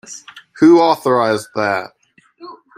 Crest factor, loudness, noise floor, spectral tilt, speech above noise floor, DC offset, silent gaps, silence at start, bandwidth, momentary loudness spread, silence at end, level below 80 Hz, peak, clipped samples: 14 dB; -14 LUFS; -42 dBFS; -5.5 dB/octave; 29 dB; under 0.1%; none; 0.1 s; 15 kHz; 23 LU; 0.25 s; -60 dBFS; -2 dBFS; under 0.1%